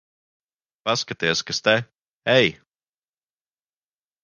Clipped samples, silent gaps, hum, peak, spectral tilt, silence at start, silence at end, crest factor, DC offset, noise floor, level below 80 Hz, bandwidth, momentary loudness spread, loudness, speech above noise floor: under 0.1%; 2.13-2.20 s; none; -2 dBFS; -3.5 dB/octave; 0.85 s; 1.7 s; 24 dB; under 0.1%; under -90 dBFS; -62 dBFS; 10 kHz; 8 LU; -21 LUFS; over 69 dB